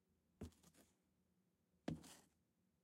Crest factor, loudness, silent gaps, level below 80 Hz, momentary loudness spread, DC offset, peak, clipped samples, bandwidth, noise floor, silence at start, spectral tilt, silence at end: 28 dB; -56 LUFS; none; -78 dBFS; 11 LU; under 0.1%; -32 dBFS; under 0.1%; 16 kHz; -84 dBFS; 0.4 s; -6 dB/octave; 0.6 s